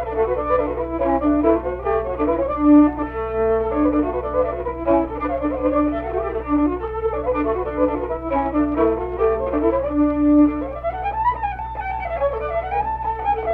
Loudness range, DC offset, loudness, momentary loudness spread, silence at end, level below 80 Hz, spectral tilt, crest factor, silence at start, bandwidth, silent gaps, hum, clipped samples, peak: 3 LU; under 0.1%; -20 LUFS; 8 LU; 0 s; -36 dBFS; -10.5 dB/octave; 16 dB; 0 s; 3.8 kHz; none; none; under 0.1%; -4 dBFS